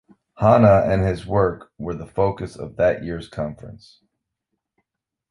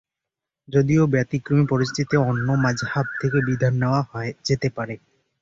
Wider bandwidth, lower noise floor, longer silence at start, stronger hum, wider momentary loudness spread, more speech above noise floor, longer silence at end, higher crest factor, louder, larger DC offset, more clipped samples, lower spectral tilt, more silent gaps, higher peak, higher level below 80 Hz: first, 11 kHz vs 7.6 kHz; second, -80 dBFS vs -86 dBFS; second, 0.4 s vs 0.7 s; neither; first, 17 LU vs 9 LU; second, 61 dB vs 65 dB; first, 1.55 s vs 0.45 s; about the same, 20 dB vs 16 dB; about the same, -20 LUFS vs -22 LUFS; neither; neither; first, -8.5 dB/octave vs -7 dB/octave; neither; first, -2 dBFS vs -6 dBFS; first, -42 dBFS vs -52 dBFS